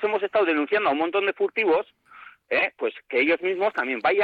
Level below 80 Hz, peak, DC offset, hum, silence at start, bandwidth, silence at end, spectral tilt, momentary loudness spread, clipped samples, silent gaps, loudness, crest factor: -68 dBFS; -12 dBFS; under 0.1%; none; 0 s; 5 kHz; 0 s; -6 dB/octave; 4 LU; under 0.1%; none; -23 LUFS; 12 dB